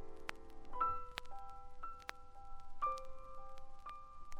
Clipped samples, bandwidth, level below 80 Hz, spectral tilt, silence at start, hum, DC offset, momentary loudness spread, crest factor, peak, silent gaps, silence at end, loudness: under 0.1%; 11.5 kHz; -54 dBFS; -3.5 dB/octave; 0 s; none; under 0.1%; 19 LU; 24 dB; -20 dBFS; none; 0 s; -46 LUFS